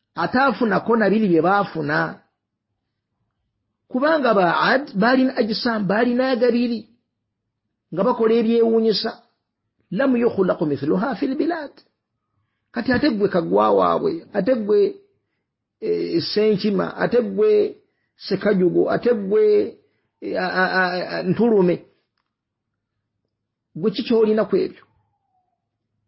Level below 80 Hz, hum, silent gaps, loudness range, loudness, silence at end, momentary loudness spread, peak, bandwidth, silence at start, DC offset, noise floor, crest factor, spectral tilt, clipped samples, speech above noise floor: -58 dBFS; none; none; 4 LU; -19 LUFS; 1.35 s; 10 LU; -4 dBFS; 5.8 kHz; 0.15 s; under 0.1%; -80 dBFS; 16 dB; -10.5 dB/octave; under 0.1%; 61 dB